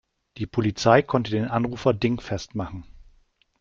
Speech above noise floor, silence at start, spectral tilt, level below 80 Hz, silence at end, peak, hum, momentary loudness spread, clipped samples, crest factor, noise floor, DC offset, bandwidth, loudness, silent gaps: 38 dB; 0.35 s; -6.5 dB/octave; -50 dBFS; 0.6 s; -2 dBFS; none; 15 LU; under 0.1%; 22 dB; -61 dBFS; under 0.1%; 7.4 kHz; -24 LUFS; none